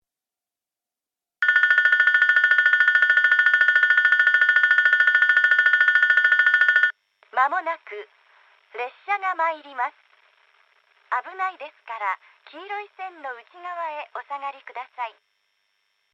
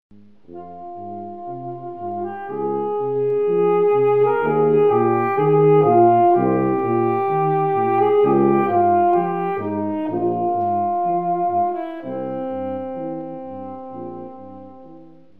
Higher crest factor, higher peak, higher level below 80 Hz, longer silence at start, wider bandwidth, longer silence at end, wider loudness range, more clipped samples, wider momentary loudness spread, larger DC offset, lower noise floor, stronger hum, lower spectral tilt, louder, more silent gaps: about the same, 16 dB vs 16 dB; about the same, -6 dBFS vs -4 dBFS; second, under -90 dBFS vs -62 dBFS; first, 1.4 s vs 0.5 s; first, 7 kHz vs 3.7 kHz; first, 1.05 s vs 0.35 s; first, 17 LU vs 11 LU; neither; about the same, 19 LU vs 17 LU; second, under 0.1% vs 0.5%; first, -89 dBFS vs -45 dBFS; neither; second, 1.5 dB/octave vs -11 dB/octave; about the same, -18 LUFS vs -19 LUFS; neither